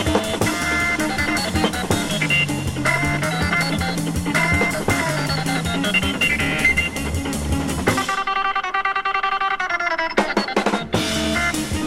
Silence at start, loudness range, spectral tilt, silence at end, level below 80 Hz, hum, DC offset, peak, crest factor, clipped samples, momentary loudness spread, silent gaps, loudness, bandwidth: 0 s; 2 LU; -4 dB/octave; 0 s; -36 dBFS; none; under 0.1%; -4 dBFS; 16 dB; under 0.1%; 4 LU; none; -20 LUFS; 16.5 kHz